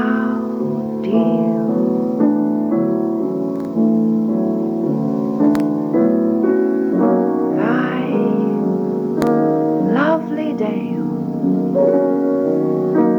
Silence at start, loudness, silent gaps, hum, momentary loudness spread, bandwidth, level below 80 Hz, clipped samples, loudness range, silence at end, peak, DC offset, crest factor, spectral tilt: 0 s; -17 LUFS; none; none; 5 LU; 7.2 kHz; -60 dBFS; under 0.1%; 1 LU; 0 s; -2 dBFS; under 0.1%; 14 dB; -9 dB/octave